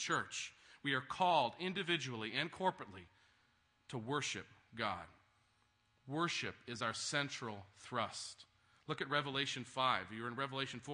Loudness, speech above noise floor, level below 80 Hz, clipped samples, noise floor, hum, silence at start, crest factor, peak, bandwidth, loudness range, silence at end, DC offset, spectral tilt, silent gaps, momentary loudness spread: -40 LUFS; 36 dB; -80 dBFS; under 0.1%; -76 dBFS; none; 0 s; 22 dB; -18 dBFS; 10.5 kHz; 5 LU; 0 s; under 0.1%; -3.5 dB/octave; none; 13 LU